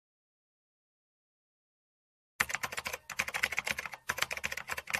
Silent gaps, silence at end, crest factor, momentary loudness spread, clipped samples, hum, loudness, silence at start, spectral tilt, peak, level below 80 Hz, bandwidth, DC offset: none; 0 s; 32 dB; 6 LU; under 0.1%; none; -35 LUFS; 2.4 s; -0.5 dB/octave; -6 dBFS; -66 dBFS; 15.5 kHz; under 0.1%